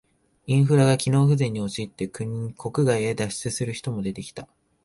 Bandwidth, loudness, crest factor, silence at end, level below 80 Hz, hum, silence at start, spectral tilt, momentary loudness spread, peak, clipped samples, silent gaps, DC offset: 11.5 kHz; -24 LUFS; 18 dB; 0.4 s; -56 dBFS; none; 0.45 s; -6 dB/octave; 13 LU; -6 dBFS; under 0.1%; none; under 0.1%